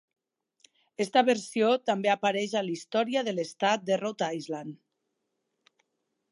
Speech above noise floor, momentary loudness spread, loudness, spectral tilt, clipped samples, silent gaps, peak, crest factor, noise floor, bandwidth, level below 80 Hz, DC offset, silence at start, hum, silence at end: 53 dB; 11 LU; -28 LUFS; -4 dB/octave; under 0.1%; none; -10 dBFS; 20 dB; -81 dBFS; 11.5 kHz; -84 dBFS; under 0.1%; 1 s; none; 1.55 s